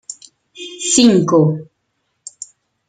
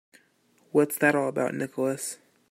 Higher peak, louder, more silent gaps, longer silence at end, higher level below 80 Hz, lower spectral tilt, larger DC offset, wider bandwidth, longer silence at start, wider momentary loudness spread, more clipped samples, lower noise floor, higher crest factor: first, 0 dBFS vs -8 dBFS; first, -13 LUFS vs -26 LUFS; neither; about the same, 0.45 s vs 0.35 s; first, -58 dBFS vs -76 dBFS; about the same, -4.5 dB/octave vs -5 dB/octave; neither; second, 9.6 kHz vs 16 kHz; second, 0.1 s vs 0.75 s; first, 25 LU vs 11 LU; neither; first, -69 dBFS vs -65 dBFS; about the same, 16 dB vs 20 dB